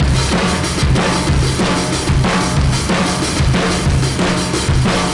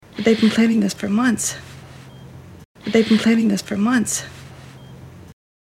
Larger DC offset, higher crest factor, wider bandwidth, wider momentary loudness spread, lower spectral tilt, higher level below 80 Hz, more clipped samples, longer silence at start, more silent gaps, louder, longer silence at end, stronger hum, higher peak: neither; second, 12 dB vs 18 dB; second, 11.5 kHz vs 15 kHz; second, 1 LU vs 25 LU; about the same, -4.5 dB/octave vs -4.5 dB/octave; first, -22 dBFS vs -56 dBFS; neither; second, 0 s vs 0.15 s; second, none vs 2.65-2.75 s; first, -15 LUFS vs -18 LUFS; second, 0 s vs 0.4 s; neither; about the same, -4 dBFS vs -2 dBFS